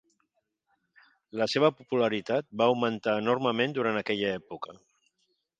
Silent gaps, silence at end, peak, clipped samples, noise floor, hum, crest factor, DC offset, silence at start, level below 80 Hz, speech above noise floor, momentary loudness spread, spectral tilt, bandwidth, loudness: none; 0.9 s; -8 dBFS; under 0.1%; -78 dBFS; none; 22 dB; under 0.1%; 1.35 s; -72 dBFS; 50 dB; 13 LU; -5.5 dB/octave; 9.2 kHz; -28 LUFS